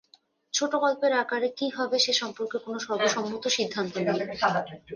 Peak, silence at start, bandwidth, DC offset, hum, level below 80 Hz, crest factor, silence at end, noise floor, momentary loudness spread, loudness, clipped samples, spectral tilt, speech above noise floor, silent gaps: -8 dBFS; 0.55 s; 10.5 kHz; under 0.1%; none; -70 dBFS; 20 dB; 0 s; -62 dBFS; 8 LU; -27 LUFS; under 0.1%; -2.5 dB/octave; 35 dB; none